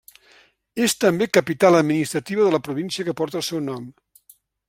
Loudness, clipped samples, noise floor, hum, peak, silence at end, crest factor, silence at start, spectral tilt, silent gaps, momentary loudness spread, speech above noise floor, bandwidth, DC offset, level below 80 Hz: -20 LUFS; under 0.1%; -56 dBFS; none; -2 dBFS; 0.8 s; 20 dB; 0.75 s; -4.5 dB/octave; none; 13 LU; 35 dB; 16.5 kHz; under 0.1%; -64 dBFS